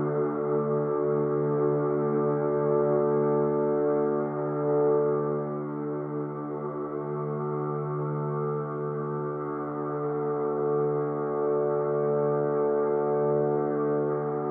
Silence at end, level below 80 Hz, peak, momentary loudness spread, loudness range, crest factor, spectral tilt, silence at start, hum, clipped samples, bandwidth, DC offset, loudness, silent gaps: 0 s; -70 dBFS; -14 dBFS; 8 LU; 6 LU; 12 dB; -13 dB/octave; 0 s; none; under 0.1%; 2.4 kHz; under 0.1%; -27 LUFS; none